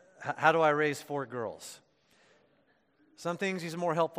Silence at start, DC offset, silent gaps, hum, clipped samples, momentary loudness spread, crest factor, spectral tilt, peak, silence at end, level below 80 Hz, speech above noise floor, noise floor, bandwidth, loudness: 0.2 s; under 0.1%; none; none; under 0.1%; 15 LU; 24 dB; -5 dB/octave; -8 dBFS; 0 s; -82 dBFS; 39 dB; -70 dBFS; 15.5 kHz; -31 LUFS